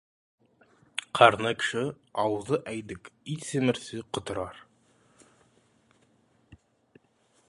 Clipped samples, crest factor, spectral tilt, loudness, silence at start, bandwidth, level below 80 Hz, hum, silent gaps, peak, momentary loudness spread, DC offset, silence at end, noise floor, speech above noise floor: under 0.1%; 28 dB; -4.5 dB/octave; -28 LUFS; 0.95 s; 11.5 kHz; -64 dBFS; none; none; -2 dBFS; 18 LU; under 0.1%; 0.95 s; -67 dBFS; 40 dB